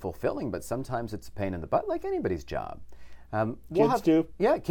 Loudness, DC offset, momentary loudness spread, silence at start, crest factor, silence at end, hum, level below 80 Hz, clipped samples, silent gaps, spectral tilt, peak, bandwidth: -29 LUFS; under 0.1%; 12 LU; 0 s; 18 dB; 0 s; none; -50 dBFS; under 0.1%; none; -7 dB/octave; -10 dBFS; 17.5 kHz